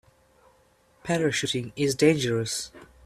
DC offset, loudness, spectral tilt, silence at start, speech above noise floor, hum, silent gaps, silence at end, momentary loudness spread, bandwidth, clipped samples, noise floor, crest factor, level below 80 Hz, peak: under 0.1%; -25 LUFS; -4.5 dB/octave; 1.05 s; 37 dB; none; none; 0.2 s; 11 LU; 14.5 kHz; under 0.1%; -62 dBFS; 20 dB; -60 dBFS; -6 dBFS